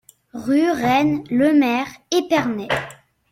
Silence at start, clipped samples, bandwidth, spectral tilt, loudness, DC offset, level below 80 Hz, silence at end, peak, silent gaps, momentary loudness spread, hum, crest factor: 0.35 s; under 0.1%; 15.5 kHz; -5 dB/octave; -19 LUFS; under 0.1%; -56 dBFS; 0.35 s; -4 dBFS; none; 10 LU; none; 16 dB